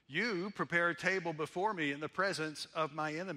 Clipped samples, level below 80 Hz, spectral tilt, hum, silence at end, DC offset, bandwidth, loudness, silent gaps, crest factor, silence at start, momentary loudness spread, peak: under 0.1%; -80 dBFS; -4.5 dB/octave; none; 0 s; under 0.1%; 14 kHz; -36 LUFS; none; 20 dB; 0.1 s; 6 LU; -18 dBFS